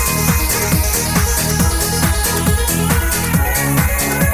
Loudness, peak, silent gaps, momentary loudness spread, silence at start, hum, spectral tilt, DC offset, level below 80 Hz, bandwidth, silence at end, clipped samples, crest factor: -15 LUFS; -2 dBFS; none; 1 LU; 0 s; none; -4 dB/octave; under 0.1%; -20 dBFS; 16 kHz; 0 s; under 0.1%; 12 dB